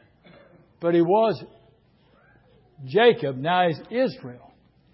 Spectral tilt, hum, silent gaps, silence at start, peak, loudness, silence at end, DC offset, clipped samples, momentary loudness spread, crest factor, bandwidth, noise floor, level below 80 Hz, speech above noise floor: -10.5 dB/octave; none; none; 0.8 s; -6 dBFS; -22 LUFS; 0.6 s; under 0.1%; under 0.1%; 18 LU; 18 dB; 5.8 kHz; -59 dBFS; -68 dBFS; 38 dB